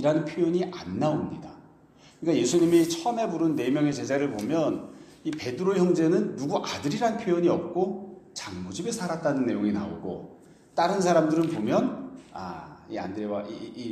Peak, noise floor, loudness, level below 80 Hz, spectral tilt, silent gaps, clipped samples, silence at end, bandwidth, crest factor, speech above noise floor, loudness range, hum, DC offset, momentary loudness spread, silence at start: -8 dBFS; -55 dBFS; -27 LUFS; -64 dBFS; -6 dB/octave; none; under 0.1%; 0 s; 14.5 kHz; 18 dB; 29 dB; 3 LU; none; under 0.1%; 16 LU; 0 s